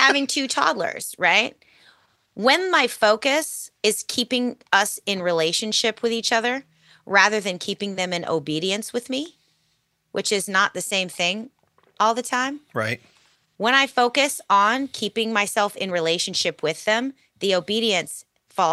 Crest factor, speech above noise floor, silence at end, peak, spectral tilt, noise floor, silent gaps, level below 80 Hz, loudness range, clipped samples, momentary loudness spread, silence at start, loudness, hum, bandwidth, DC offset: 22 dB; 47 dB; 0 s; 0 dBFS; -2 dB/octave; -69 dBFS; none; -74 dBFS; 4 LU; under 0.1%; 10 LU; 0 s; -21 LUFS; none; 13 kHz; under 0.1%